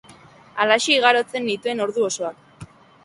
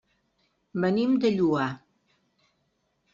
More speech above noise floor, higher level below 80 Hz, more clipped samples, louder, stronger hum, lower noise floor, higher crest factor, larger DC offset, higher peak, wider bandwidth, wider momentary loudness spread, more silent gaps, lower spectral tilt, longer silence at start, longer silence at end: second, 28 dB vs 50 dB; about the same, -64 dBFS vs -68 dBFS; neither; first, -20 LUFS vs -25 LUFS; neither; second, -48 dBFS vs -74 dBFS; about the same, 20 dB vs 16 dB; neither; first, -2 dBFS vs -12 dBFS; first, 11.5 kHz vs 7.6 kHz; about the same, 12 LU vs 12 LU; neither; second, -2 dB/octave vs -6 dB/octave; second, 0.55 s vs 0.75 s; second, 0.4 s vs 1.35 s